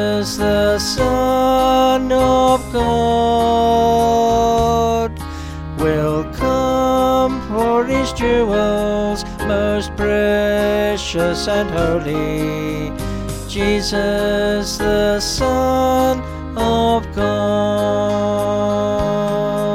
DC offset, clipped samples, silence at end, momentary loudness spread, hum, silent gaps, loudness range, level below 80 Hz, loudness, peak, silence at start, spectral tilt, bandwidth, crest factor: under 0.1%; under 0.1%; 0 s; 7 LU; none; none; 4 LU; -30 dBFS; -17 LUFS; -4 dBFS; 0 s; -5 dB/octave; 16.5 kHz; 12 dB